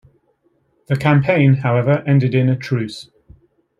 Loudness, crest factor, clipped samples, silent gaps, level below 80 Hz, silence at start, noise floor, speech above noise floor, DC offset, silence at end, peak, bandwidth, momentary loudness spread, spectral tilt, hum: -16 LUFS; 14 dB; under 0.1%; none; -54 dBFS; 0.9 s; -62 dBFS; 47 dB; under 0.1%; 0.8 s; -2 dBFS; 7.4 kHz; 9 LU; -8.5 dB/octave; none